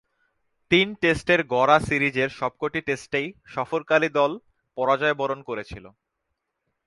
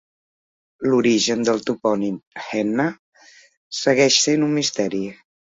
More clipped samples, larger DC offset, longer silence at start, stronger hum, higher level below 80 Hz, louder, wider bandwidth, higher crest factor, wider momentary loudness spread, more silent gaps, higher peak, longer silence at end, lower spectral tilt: neither; neither; about the same, 0.7 s vs 0.8 s; neither; first, -54 dBFS vs -64 dBFS; second, -23 LUFS vs -20 LUFS; first, 11.5 kHz vs 7.8 kHz; about the same, 22 dB vs 18 dB; about the same, 14 LU vs 13 LU; second, none vs 2.27-2.31 s, 2.99-3.12 s, 3.57-3.71 s; about the same, -4 dBFS vs -2 dBFS; first, 1 s vs 0.45 s; first, -5 dB/octave vs -3.5 dB/octave